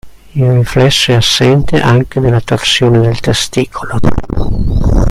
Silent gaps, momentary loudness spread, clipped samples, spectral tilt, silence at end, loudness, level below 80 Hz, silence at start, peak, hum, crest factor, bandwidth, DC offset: none; 8 LU; 0.2%; -5 dB/octave; 0 s; -11 LUFS; -20 dBFS; 0.05 s; 0 dBFS; none; 10 dB; 13.5 kHz; under 0.1%